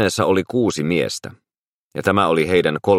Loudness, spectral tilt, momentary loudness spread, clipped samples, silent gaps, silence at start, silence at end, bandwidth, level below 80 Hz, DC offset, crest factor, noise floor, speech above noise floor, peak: -18 LUFS; -5 dB/octave; 12 LU; under 0.1%; 1.58-1.91 s; 0 s; 0 s; 15.5 kHz; -52 dBFS; under 0.1%; 18 dB; -77 dBFS; 59 dB; -2 dBFS